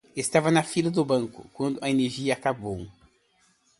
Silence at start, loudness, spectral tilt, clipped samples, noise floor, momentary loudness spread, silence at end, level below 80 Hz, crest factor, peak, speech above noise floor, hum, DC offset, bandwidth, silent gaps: 0.15 s; -26 LUFS; -5 dB/octave; under 0.1%; -66 dBFS; 13 LU; 0.9 s; -60 dBFS; 22 dB; -6 dBFS; 40 dB; none; under 0.1%; 11.5 kHz; none